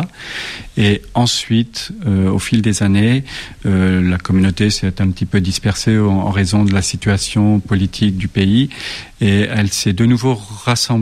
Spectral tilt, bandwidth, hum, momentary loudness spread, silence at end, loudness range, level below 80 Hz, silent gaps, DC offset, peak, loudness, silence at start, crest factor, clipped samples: -5.5 dB/octave; 14 kHz; none; 7 LU; 0 s; 1 LU; -36 dBFS; none; under 0.1%; -2 dBFS; -15 LUFS; 0 s; 12 dB; under 0.1%